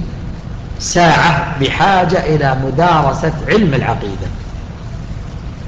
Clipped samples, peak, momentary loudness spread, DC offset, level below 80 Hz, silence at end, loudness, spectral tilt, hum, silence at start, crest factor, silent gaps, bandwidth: under 0.1%; -2 dBFS; 17 LU; under 0.1%; -28 dBFS; 0 s; -13 LUFS; -5.5 dB/octave; none; 0 s; 14 dB; none; 8.4 kHz